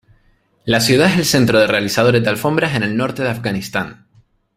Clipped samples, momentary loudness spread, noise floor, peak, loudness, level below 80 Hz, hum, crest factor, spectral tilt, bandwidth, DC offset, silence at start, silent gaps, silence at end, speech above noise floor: under 0.1%; 10 LU; -57 dBFS; 0 dBFS; -15 LUFS; -48 dBFS; none; 16 dB; -4.5 dB/octave; 16 kHz; under 0.1%; 0.65 s; none; 0.65 s; 41 dB